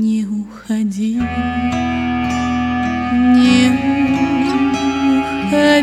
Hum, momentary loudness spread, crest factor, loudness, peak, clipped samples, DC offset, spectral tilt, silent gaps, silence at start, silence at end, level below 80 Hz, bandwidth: none; 8 LU; 14 dB; -16 LUFS; -2 dBFS; under 0.1%; under 0.1%; -5.5 dB/octave; none; 0 s; 0 s; -38 dBFS; 11 kHz